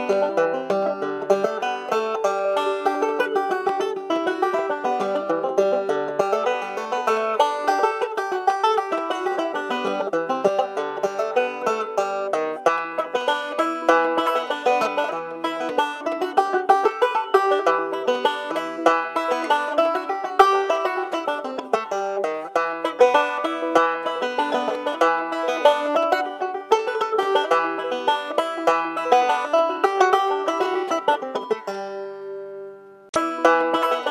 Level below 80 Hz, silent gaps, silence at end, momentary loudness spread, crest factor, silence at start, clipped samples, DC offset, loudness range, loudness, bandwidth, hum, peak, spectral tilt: -74 dBFS; 33.09-33.13 s; 0 s; 7 LU; 22 dB; 0 s; under 0.1%; under 0.1%; 3 LU; -22 LUFS; 14.5 kHz; none; 0 dBFS; -3.5 dB/octave